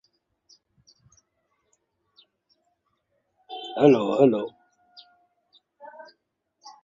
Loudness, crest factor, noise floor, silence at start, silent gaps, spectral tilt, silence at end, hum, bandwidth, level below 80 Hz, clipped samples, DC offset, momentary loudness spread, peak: -21 LUFS; 24 dB; -75 dBFS; 3.5 s; none; -7.5 dB/octave; 0.15 s; none; 7.6 kHz; -72 dBFS; under 0.1%; under 0.1%; 27 LU; -4 dBFS